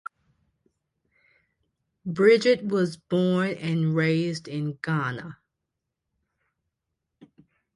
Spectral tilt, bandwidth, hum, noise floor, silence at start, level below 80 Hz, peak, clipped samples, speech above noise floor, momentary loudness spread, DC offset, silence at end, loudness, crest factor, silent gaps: -7 dB/octave; 11 kHz; none; -83 dBFS; 2.05 s; -68 dBFS; -6 dBFS; under 0.1%; 60 dB; 17 LU; under 0.1%; 2.4 s; -24 LUFS; 20 dB; none